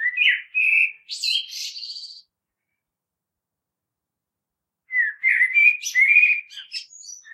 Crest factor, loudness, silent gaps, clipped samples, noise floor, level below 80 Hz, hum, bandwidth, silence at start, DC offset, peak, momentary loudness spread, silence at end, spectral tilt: 20 dB; -17 LUFS; none; under 0.1%; -85 dBFS; under -90 dBFS; none; 13.5 kHz; 0 s; under 0.1%; -4 dBFS; 19 LU; 0.05 s; 7 dB/octave